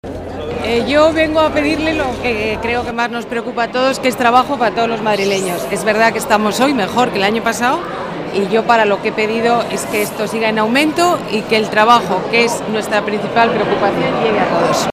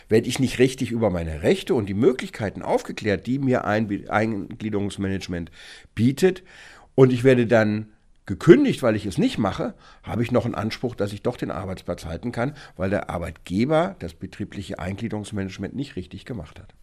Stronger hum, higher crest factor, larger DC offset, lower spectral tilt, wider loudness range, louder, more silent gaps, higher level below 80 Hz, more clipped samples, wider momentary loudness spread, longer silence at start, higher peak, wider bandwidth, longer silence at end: neither; second, 14 dB vs 22 dB; neither; second, -4 dB/octave vs -6.5 dB/octave; second, 2 LU vs 8 LU; first, -15 LUFS vs -23 LUFS; neither; first, -42 dBFS vs -48 dBFS; neither; second, 7 LU vs 16 LU; about the same, 0.05 s vs 0.1 s; about the same, 0 dBFS vs 0 dBFS; first, 16 kHz vs 14 kHz; second, 0 s vs 0.15 s